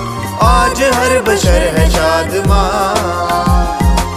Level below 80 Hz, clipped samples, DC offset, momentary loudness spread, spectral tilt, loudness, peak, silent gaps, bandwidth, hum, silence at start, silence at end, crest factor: -16 dBFS; under 0.1%; under 0.1%; 4 LU; -5 dB/octave; -12 LUFS; 0 dBFS; none; 15.5 kHz; none; 0 s; 0 s; 12 dB